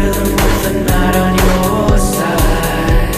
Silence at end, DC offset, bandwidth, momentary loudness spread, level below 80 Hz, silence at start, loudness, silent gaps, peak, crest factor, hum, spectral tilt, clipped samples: 0 s; 0.3%; 15.5 kHz; 2 LU; -16 dBFS; 0 s; -13 LUFS; none; 0 dBFS; 12 dB; none; -5 dB/octave; under 0.1%